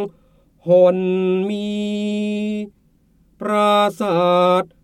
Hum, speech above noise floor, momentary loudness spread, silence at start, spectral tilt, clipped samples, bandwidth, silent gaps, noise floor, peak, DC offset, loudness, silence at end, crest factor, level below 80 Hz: none; 39 dB; 15 LU; 0 s; -6.5 dB/octave; under 0.1%; 13 kHz; none; -57 dBFS; -2 dBFS; under 0.1%; -18 LUFS; 0.2 s; 16 dB; -60 dBFS